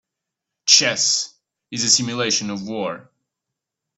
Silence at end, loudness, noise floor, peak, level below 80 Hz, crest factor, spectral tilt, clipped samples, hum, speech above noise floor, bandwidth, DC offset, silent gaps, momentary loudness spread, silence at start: 0.95 s; -17 LUFS; -83 dBFS; 0 dBFS; -66 dBFS; 22 dB; -1 dB/octave; under 0.1%; none; 63 dB; 16 kHz; under 0.1%; none; 17 LU; 0.65 s